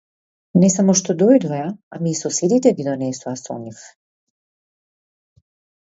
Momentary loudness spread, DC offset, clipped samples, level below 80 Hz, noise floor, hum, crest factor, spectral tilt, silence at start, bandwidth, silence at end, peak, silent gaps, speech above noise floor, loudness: 14 LU; under 0.1%; under 0.1%; -66 dBFS; under -90 dBFS; none; 18 dB; -5.5 dB/octave; 0.55 s; 8 kHz; 1.95 s; -2 dBFS; 1.83-1.91 s; over 72 dB; -18 LUFS